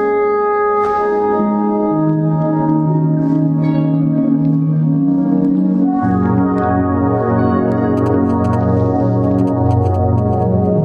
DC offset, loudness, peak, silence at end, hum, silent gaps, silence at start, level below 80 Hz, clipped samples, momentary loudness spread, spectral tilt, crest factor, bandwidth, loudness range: under 0.1%; -14 LUFS; -2 dBFS; 0 s; none; none; 0 s; -42 dBFS; under 0.1%; 1 LU; -11 dB/octave; 10 dB; 5 kHz; 0 LU